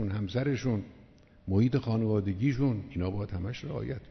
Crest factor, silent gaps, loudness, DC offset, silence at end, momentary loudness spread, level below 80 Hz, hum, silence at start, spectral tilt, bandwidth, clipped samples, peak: 16 dB; none; -31 LUFS; under 0.1%; 0 s; 9 LU; -52 dBFS; none; 0 s; -8.5 dB/octave; 6.4 kHz; under 0.1%; -14 dBFS